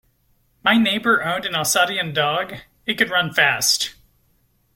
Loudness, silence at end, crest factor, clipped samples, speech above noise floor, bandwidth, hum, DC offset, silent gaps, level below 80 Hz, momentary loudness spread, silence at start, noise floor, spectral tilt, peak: -19 LUFS; 0.85 s; 20 dB; under 0.1%; 43 dB; 16.5 kHz; none; under 0.1%; none; -60 dBFS; 9 LU; 0.65 s; -62 dBFS; -2 dB/octave; -2 dBFS